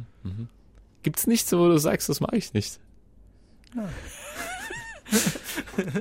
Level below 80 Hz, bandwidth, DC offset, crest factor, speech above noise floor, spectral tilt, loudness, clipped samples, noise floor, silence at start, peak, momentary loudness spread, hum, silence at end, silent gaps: -52 dBFS; 16.5 kHz; under 0.1%; 20 dB; 29 dB; -4.5 dB/octave; -26 LUFS; under 0.1%; -54 dBFS; 0 s; -8 dBFS; 18 LU; none; 0 s; none